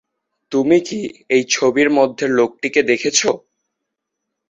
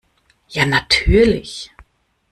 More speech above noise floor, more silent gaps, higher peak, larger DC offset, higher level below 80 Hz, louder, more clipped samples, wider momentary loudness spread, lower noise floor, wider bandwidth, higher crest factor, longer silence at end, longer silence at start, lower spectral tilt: first, 62 dB vs 41 dB; neither; about the same, 0 dBFS vs 0 dBFS; neither; second, -60 dBFS vs -28 dBFS; about the same, -16 LUFS vs -15 LUFS; neither; second, 8 LU vs 18 LU; first, -78 dBFS vs -56 dBFS; second, 8.4 kHz vs 13.5 kHz; about the same, 16 dB vs 18 dB; first, 1.1 s vs 0.65 s; about the same, 0.5 s vs 0.5 s; second, -3 dB/octave vs -5 dB/octave